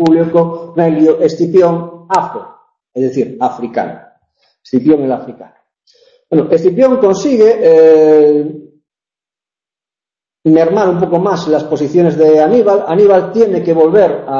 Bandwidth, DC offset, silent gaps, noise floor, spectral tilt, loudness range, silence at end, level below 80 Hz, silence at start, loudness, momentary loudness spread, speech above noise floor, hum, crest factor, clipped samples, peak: 7.6 kHz; under 0.1%; none; -90 dBFS; -7.5 dB/octave; 7 LU; 0 s; -54 dBFS; 0 s; -10 LUFS; 11 LU; 80 dB; none; 10 dB; under 0.1%; 0 dBFS